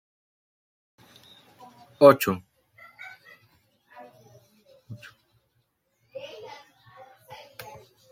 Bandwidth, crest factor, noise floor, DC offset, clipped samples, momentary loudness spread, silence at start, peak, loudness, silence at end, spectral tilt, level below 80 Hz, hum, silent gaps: 16.5 kHz; 28 dB; -73 dBFS; under 0.1%; under 0.1%; 30 LU; 2 s; -2 dBFS; -20 LUFS; 1.85 s; -5.5 dB/octave; -74 dBFS; none; none